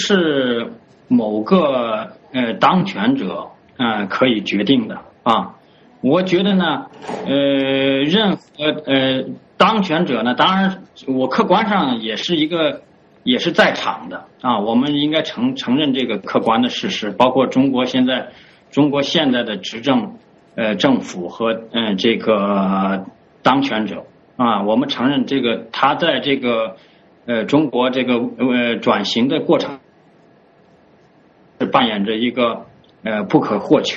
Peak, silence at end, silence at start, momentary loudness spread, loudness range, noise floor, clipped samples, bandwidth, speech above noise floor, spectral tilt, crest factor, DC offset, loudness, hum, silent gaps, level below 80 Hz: 0 dBFS; 0 s; 0 s; 10 LU; 2 LU; -51 dBFS; under 0.1%; 7.8 kHz; 34 dB; -3.5 dB/octave; 18 dB; under 0.1%; -17 LUFS; none; none; -58 dBFS